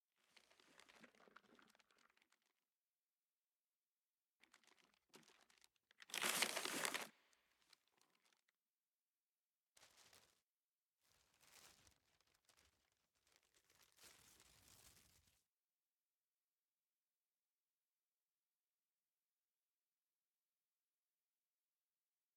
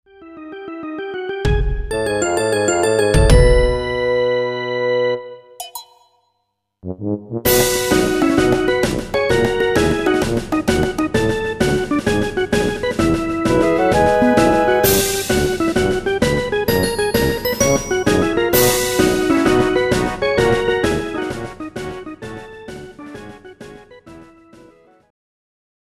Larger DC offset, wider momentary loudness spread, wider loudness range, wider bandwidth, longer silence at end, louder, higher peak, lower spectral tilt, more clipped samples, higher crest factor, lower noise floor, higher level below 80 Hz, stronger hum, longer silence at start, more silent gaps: neither; first, 27 LU vs 18 LU; about the same, 7 LU vs 7 LU; first, 17.5 kHz vs 15.5 kHz; first, 7.45 s vs 1.75 s; second, -44 LUFS vs -17 LUFS; second, -20 dBFS vs 0 dBFS; second, 0 dB/octave vs -4.5 dB/octave; neither; first, 38 dB vs 18 dB; first, under -90 dBFS vs -71 dBFS; second, under -90 dBFS vs -28 dBFS; neither; first, 0.9 s vs 0.2 s; first, 2.75-4.15 s, 4.24-4.40 s, 8.55-8.59 s, 8.67-9.73 s, 10.42-10.97 s vs none